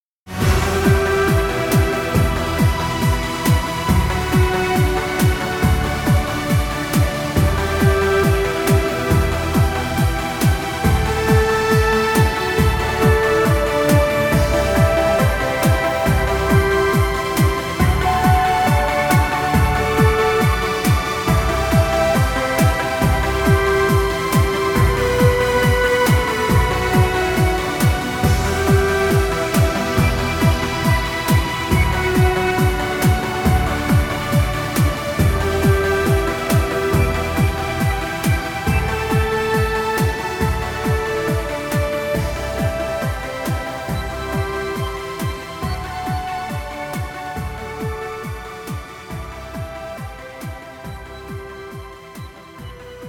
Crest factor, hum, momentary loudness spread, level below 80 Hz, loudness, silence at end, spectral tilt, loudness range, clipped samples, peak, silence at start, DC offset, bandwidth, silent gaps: 16 dB; none; 12 LU; -26 dBFS; -18 LUFS; 0 s; -5.5 dB/octave; 10 LU; under 0.1%; -2 dBFS; 0.25 s; under 0.1%; 18.5 kHz; none